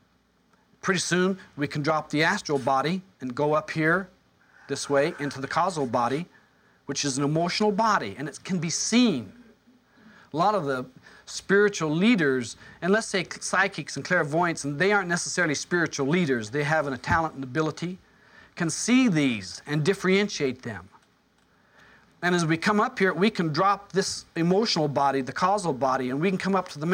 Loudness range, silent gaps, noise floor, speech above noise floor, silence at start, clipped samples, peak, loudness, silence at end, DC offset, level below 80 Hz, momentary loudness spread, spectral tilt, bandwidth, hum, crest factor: 3 LU; none; -65 dBFS; 40 dB; 0.85 s; under 0.1%; -8 dBFS; -25 LUFS; 0 s; under 0.1%; -60 dBFS; 11 LU; -4.5 dB/octave; 16 kHz; none; 18 dB